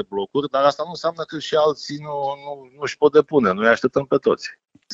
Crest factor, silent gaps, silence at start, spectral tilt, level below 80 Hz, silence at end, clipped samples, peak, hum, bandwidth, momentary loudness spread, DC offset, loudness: 20 dB; none; 0 s; -5 dB/octave; -62 dBFS; 0 s; under 0.1%; -2 dBFS; none; 7.8 kHz; 13 LU; under 0.1%; -20 LUFS